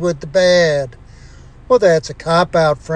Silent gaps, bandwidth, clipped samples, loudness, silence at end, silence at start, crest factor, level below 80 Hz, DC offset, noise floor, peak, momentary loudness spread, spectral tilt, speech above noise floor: none; 9.6 kHz; under 0.1%; -14 LUFS; 0 s; 0 s; 14 dB; -40 dBFS; under 0.1%; -39 dBFS; -2 dBFS; 6 LU; -5 dB/octave; 25 dB